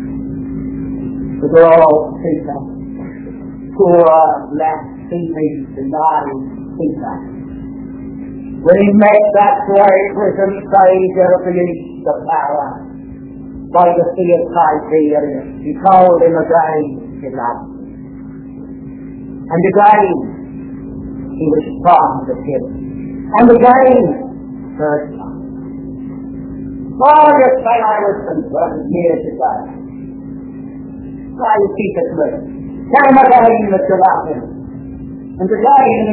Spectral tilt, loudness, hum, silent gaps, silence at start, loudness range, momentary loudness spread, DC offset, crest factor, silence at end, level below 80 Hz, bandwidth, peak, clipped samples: -11 dB/octave; -12 LUFS; none; none; 0 s; 7 LU; 21 LU; under 0.1%; 12 dB; 0 s; -40 dBFS; 4 kHz; 0 dBFS; 0.3%